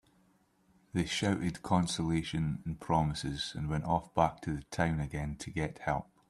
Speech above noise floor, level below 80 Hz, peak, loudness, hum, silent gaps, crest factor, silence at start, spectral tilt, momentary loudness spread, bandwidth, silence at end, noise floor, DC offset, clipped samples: 36 dB; -52 dBFS; -12 dBFS; -34 LUFS; none; none; 22 dB; 0.95 s; -5.5 dB/octave; 7 LU; 12.5 kHz; 0.25 s; -69 dBFS; under 0.1%; under 0.1%